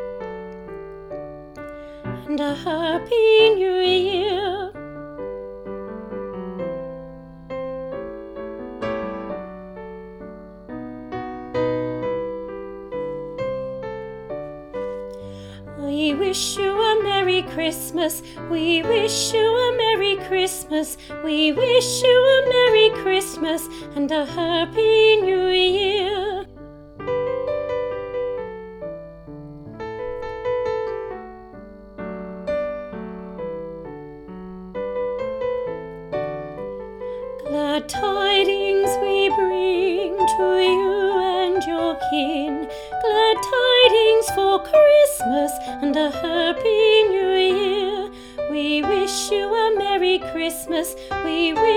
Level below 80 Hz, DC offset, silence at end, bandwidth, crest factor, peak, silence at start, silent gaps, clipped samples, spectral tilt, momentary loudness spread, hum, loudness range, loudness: -48 dBFS; under 0.1%; 0 s; 17.5 kHz; 20 dB; 0 dBFS; 0 s; none; under 0.1%; -3.5 dB/octave; 19 LU; none; 13 LU; -20 LUFS